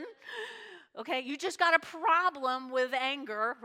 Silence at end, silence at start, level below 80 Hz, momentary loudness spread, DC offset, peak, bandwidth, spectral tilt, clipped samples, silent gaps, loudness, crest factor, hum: 0 s; 0 s; -88 dBFS; 17 LU; under 0.1%; -8 dBFS; 16 kHz; -1.5 dB/octave; under 0.1%; none; -30 LUFS; 24 dB; none